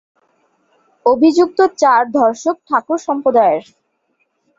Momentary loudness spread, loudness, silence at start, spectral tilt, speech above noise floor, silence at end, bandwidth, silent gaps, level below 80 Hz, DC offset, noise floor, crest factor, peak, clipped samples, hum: 7 LU; -14 LUFS; 1.05 s; -4.5 dB/octave; 52 dB; 1 s; 7.8 kHz; none; -62 dBFS; under 0.1%; -65 dBFS; 14 dB; -2 dBFS; under 0.1%; none